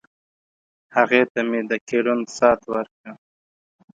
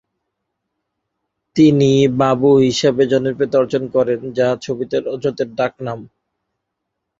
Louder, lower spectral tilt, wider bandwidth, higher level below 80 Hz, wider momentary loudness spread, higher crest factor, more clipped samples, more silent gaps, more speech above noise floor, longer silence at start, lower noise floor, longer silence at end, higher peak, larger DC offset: second, -20 LUFS vs -16 LUFS; second, -4.5 dB/octave vs -6.5 dB/octave; first, 9.2 kHz vs 7.8 kHz; second, -64 dBFS vs -54 dBFS; about the same, 10 LU vs 10 LU; first, 22 dB vs 16 dB; neither; first, 1.30-1.35 s, 1.81-1.87 s, 2.91-3.04 s vs none; first, over 70 dB vs 62 dB; second, 0.95 s vs 1.55 s; first, under -90 dBFS vs -77 dBFS; second, 0.85 s vs 1.15 s; about the same, -2 dBFS vs -2 dBFS; neither